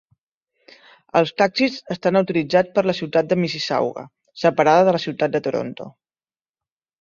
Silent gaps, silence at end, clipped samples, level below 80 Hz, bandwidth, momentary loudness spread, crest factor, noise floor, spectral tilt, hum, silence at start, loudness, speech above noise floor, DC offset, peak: none; 1.1 s; under 0.1%; -62 dBFS; 7.4 kHz; 11 LU; 20 dB; under -90 dBFS; -6 dB/octave; none; 1.15 s; -20 LUFS; over 71 dB; under 0.1%; -2 dBFS